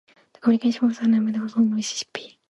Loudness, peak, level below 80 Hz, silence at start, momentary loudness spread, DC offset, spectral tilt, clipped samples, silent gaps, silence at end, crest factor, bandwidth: -22 LUFS; -8 dBFS; -70 dBFS; 0.45 s; 10 LU; under 0.1%; -4.5 dB/octave; under 0.1%; none; 0.25 s; 16 dB; 11.5 kHz